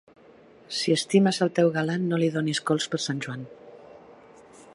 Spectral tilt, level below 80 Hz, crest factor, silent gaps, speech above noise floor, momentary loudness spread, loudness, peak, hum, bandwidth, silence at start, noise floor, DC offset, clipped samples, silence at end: -5 dB/octave; -70 dBFS; 20 dB; none; 28 dB; 12 LU; -25 LUFS; -8 dBFS; none; 11.5 kHz; 0.7 s; -53 dBFS; under 0.1%; under 0.1%; 0.6 s